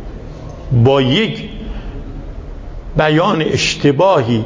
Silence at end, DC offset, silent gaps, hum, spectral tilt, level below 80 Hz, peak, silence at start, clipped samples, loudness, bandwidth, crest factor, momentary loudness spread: 0 s; under 0.1%; none; none; -6 dB/octave; -30 dBFS; 0 dBFS; 0 s; under 0.1%; -13 LUFS; 7.6 kHz; 14 dB; 20 LU